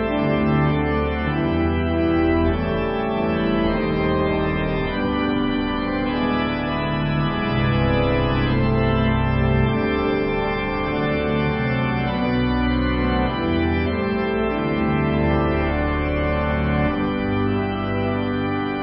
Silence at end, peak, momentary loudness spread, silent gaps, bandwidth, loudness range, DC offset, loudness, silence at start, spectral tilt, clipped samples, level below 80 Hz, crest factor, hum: 0 s; -6 dBFS; 3 LU; none; 5.6 kHz; 2 LU; under 0.1%; -21 LUFS; 0 s; -12 dB/octave; under 0.1%; -30 dBFS; 14 dB; none